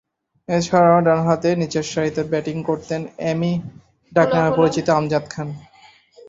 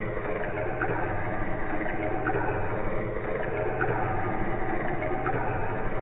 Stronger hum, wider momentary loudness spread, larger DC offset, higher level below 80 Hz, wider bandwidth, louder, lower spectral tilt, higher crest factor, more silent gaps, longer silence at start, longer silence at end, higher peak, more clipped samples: neither; first, 13 LU vs 3 LU; second, under 0.1% vs 1%; second, -54 dBFS vs -38 dBFS; first, 7.8 kHz vs 3.9 kHz; first, -19 LUFS vs -30 LUFS; about the same, -6.5 dB/octave vs -6.5 dB/octave; about the same, 18 dB vs 14 dB; neither; first, 0.5 s vs 0 s; about the same, 0.05 s vs 0 s; first, -2 dBFS vs -14 dBFS; neither